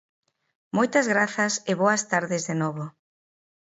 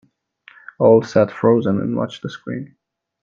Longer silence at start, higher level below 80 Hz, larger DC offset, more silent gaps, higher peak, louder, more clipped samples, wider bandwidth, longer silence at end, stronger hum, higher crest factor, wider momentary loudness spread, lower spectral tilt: about the same, 0.75 s vs 0.8 s; second, -74 dBFS vs -60 dBFS; neither; neither; second, -6 dBFS vs 0 dBFS; second, -24 LUFS vs -17 LUFS; neither; first, 8.2 kHz vs 7.2 kHz; about the same, 0.7 s vs 0.6 s; neither; about the same, 20 dB vs 18 dB; second, 9 LU vs 16 LU; second, -4 dB/octave vs -8 dB/octave